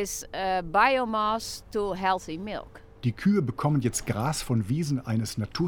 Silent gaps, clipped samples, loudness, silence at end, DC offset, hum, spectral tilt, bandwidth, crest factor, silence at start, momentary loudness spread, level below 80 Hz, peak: none; under 0.1%; -27 LUFS; 0 s; under 0.1%; none; -5 dB/octave; 19 kHz; 18 dB; 0 s; 10 LU; -50 dBFS; -8 dBFS